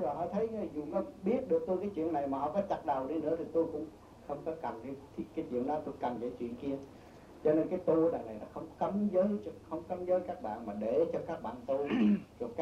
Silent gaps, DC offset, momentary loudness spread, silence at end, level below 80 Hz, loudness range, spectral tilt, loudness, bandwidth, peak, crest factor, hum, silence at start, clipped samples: none; under 0.1%; 13 LU; 0 s; -64 dBFS; 5 LU; -8.5 dB/octave; -35 LUFS; 9.8 kHz; -18 dBFS; 16 dB; none; 0 s; under 0.1%